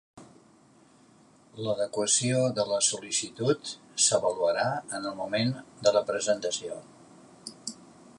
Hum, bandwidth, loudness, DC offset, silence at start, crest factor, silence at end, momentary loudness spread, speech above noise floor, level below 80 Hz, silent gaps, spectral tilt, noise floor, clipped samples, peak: none; 11.5 kHz; -27 LUFS; under 0.1%; 0.15 s; 20 dB; 0.1 s; 16 LU; 31 dB; -70 dBFS; none; -3 dB/octave; -59 dBFS; under 0.1%; -8 dBFS